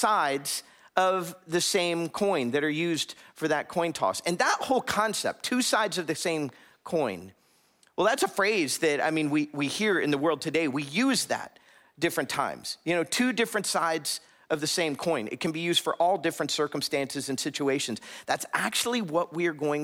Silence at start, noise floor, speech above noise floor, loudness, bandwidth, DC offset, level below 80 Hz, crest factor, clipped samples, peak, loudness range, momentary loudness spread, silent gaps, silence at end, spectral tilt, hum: 0 s; -64 dBFS; 37 dB; -27 LUFS; 16.5 kHz; under 0.1%; -74 dBFS; 20 dB; under 0.1%; -8 dBFS; 2 LU; 7 LU; none; 0 s; -3 dB/octave; none